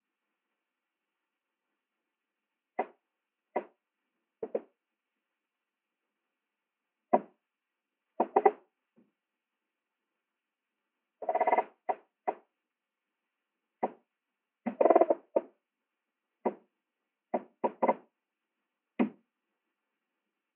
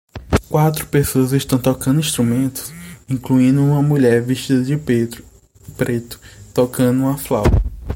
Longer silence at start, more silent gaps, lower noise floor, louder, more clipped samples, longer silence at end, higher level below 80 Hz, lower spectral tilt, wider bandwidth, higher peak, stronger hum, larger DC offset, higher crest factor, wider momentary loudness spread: first, 2.8 s vs 0.15 s; neither; first, -89 dBFS vs -41 dBFS; second, -32 LUFS vs -17 LUFS; neither; first, 1.45 s vs 0 s; second, -88 dBFS vs -30 dBFS; about the same, -5.5 dB/octave vs -6.5 dB/octave; second, 3.7 kHz vs 17 kHz; second, -8 dBFS vs -2 dBFS; neither; neither; first, 30 dB vs 16 dB; first, 14 LU vs 11 LU